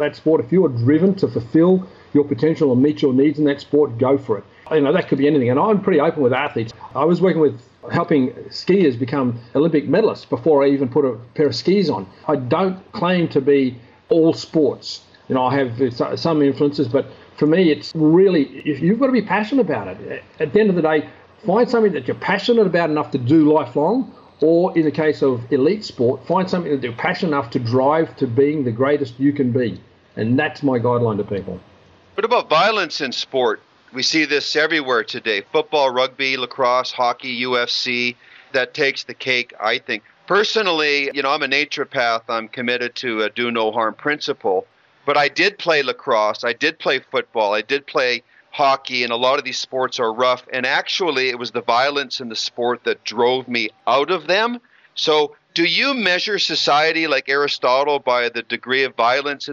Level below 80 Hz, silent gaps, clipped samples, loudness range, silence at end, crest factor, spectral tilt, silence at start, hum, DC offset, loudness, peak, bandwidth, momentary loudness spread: -62 dBFS; none; under 0.1%; 3 LU; 0 s; 18 dB; -5.5 dB/octave; 0 s; none; under 0.1%; -18 LUFS; 0 dBFS; 7.6 kHz; 7 LU